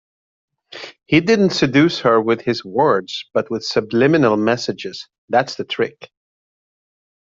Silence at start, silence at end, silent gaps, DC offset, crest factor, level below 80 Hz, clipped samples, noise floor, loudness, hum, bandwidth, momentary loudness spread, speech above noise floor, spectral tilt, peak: 0.7 s; 1.25 s; 5.18-5.28 s; under 0.1%; 16 dB; -56 dBFS; under 0.1%; -37 dBFS; -17 LUFS; none; 7.8 kHz; 13 LU; 20 dB; -5.5 dB/octave; -2 dBFS